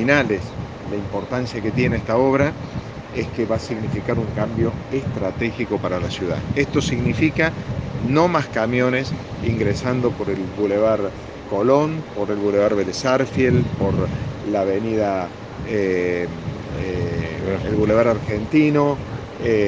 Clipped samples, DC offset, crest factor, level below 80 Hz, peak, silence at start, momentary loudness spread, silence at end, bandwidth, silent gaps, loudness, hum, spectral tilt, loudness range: under 0.1%; under 0.1%; 20 dB; -40 dBFS; 0 dBFS; 0 s; 10 LU; 0 s; 9.4 kHz; none; -21 LUFS; none; -7 dB/octave; 3 LU